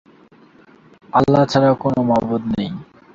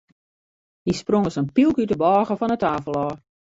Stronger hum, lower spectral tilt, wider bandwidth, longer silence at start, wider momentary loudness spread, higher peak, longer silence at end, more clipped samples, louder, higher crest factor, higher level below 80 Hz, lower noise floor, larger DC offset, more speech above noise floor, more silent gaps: neither; about the same, -7.5 dB/octave vs -7 dB/octave; about the same, 7.6 kHz vs 8 kHz; first, 1.15 s vs 0.85 s; about the same, 10 LU vs 9 LU; first, -2 dBFS vs -6 dBFS; about the same, 0.3 s vs 0.4 s; neither; first, -17 LUFS vs -21 LUFS; about the same, 16 dB vs 16 dB; about the same, -50 dBFS vs -52 dBFS; second, -49 dBFS vs under -90 dBFS; neither; second, 33 dB vs over 70 dB; neither